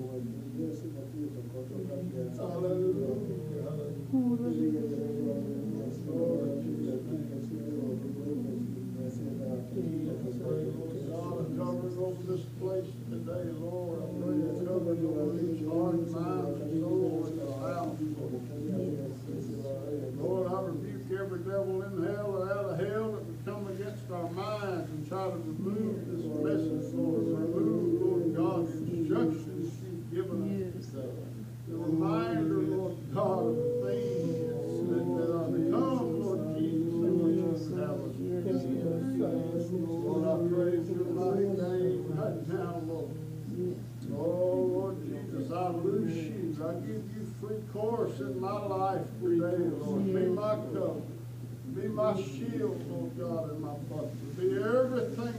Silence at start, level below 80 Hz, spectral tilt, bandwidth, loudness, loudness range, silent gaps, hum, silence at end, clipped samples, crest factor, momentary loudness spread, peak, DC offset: 0 s; -64 dBFS; -8.5 dB/octave; 15.5 kHz; -33 LUFS; 5 LU; none; none; 0 s; under 0.1%; 16 dB; 9 LU; -18 dBFS; under 0.1%